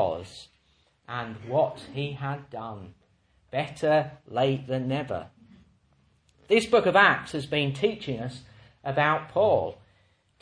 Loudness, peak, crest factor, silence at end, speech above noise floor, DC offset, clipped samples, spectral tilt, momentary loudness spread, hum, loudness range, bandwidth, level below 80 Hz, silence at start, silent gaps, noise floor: -26 LUFS; -4 dBFS; 24 dB; 0.65 s; 40 dB; under 0.1%; under 0.1%; -6 dB/octave; 17 LU; none; 8 LU; 10.5 kHz; -62 dBFS; 0 s; none; -66 dBFS